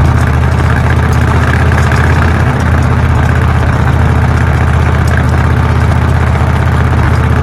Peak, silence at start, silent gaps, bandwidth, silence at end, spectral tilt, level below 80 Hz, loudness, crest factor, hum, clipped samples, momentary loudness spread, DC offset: 0 dBFS; 0 s; none; 12.5 kHz; 0 s; -7 dB/octave; -14 dBFS; -10 LUFS; 8 dB; none; under 0.1%; 1 LU; under 0.1%